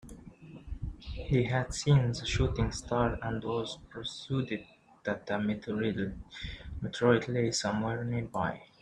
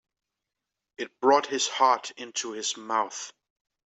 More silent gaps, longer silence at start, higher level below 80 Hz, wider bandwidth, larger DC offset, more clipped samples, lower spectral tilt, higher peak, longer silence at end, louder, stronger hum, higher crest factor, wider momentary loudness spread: neither; second, 0.05 s vs 1 s; first, -46 dBFS vs -82 dBFS; first, 10 kHz vs 8.2 kHz; neither; neither; first, -5.5 dB/octave vs -1 dB/octave; second, -12 dBFS vs -8 dBFS; second, 0.15 s vs 0.6 s; second, -32 LUFS vs -26 LUFS; neither; about the same, 20 dB vs 20 dB; about the same, 16 LU vs 16 LU